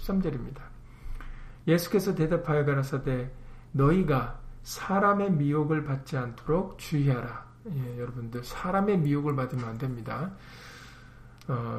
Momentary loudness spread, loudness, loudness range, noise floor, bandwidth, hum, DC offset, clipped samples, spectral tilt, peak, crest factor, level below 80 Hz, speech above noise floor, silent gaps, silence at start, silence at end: 20 LU; -29 LUFS; 4 LU; -49 dBFS; 15 kHz; none; under 0.1%; under 0.1%; -7.5 dB/octave; -10 dBFS; 18 dB; -44 dBFS; 22 dB; none; 0 s; 0 s